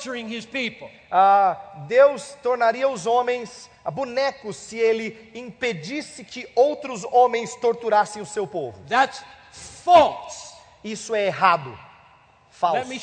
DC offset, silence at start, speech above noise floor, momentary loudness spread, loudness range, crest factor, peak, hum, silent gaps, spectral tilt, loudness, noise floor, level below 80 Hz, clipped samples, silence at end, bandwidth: under 0.1%; 0 s; 32 dB; 19 LU; 5 LU; 20 dB; -2 dBFS; none; none; -3.5 dB/octave; -22 LUFS; -54 dBFS; -62 dBFS; under 0.1%; 0 s; 9.4 kHz